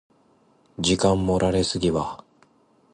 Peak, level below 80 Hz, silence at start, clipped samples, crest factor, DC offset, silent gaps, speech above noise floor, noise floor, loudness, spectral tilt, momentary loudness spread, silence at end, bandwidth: -6 dBFS; -42 dBFS; 0.8 s; under 0.1%; 18 dB; under 0.1%; none; 38 dB; -60 dBFS; -23 LUFS; -5 dB/octave; 16 LU; 0.8 s; 11.5 kHz